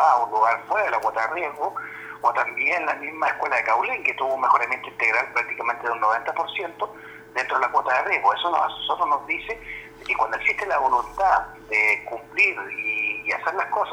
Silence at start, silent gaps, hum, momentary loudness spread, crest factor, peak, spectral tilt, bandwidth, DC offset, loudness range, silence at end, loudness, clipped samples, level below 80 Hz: 0 s; none; none; 9 LU; 18 dB; -6 dBFS; -3 dB/octave; over 20 kHz; under 0.1%; 2 LU; 0 s; -23 LUFS; under 0.1%; -56 dBFS